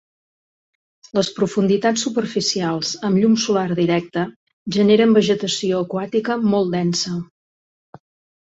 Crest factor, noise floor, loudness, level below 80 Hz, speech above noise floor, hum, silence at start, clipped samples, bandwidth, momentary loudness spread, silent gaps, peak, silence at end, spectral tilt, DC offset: 16 dB; under -90 dBFS; -19 LUFS; -60 dBFS; over 72 dB; none; 1.15 s; under 0.1%; 8 kHz; 10 LU; 4.36-4.47 s, 4.53-4.66 s; -2 dBFS; 1.2 s; -5 dB/octave; under 0.1%